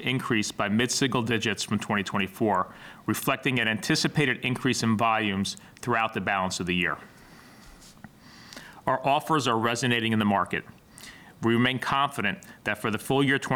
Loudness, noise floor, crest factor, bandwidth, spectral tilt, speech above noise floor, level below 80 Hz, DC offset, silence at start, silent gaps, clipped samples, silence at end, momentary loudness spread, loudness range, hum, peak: -26 LUFS; -50 dBFS; 16 dB; 19.5 kHz; -4.5 dB/octave; 24 dB; -62 dBFS; under 0.1%; 0 s; none; under 0.1%; 0 s; 10 LU; 4 LU; none; -10 dBFS